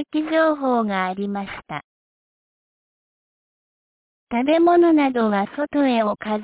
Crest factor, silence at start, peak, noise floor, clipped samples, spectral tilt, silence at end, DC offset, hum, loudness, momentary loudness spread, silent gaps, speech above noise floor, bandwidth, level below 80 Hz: 14 dB; 0 s; -6 dBFS; under -90 dBFS; under 0.1%; -10 dB/octave; 0 s; under 0.1%; none; -20 LUFS; 15 LU; 1.84-4.27 s; over 71 dB; 4 kHz; -62 dBFS